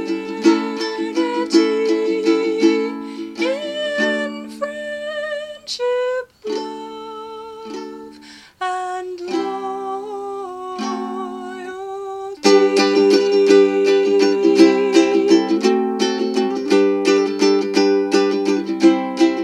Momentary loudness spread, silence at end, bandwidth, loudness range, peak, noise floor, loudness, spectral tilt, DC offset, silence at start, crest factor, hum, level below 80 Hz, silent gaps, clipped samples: 16 LU; 0 s; 11.5 kHz; 12 LU; 0 dBFS; -42 dBFS; -18 LUFS; -4 dB/octave; under 0.1%; 0 s; 18 dB; none; -66 dBFS; none; under 0.1%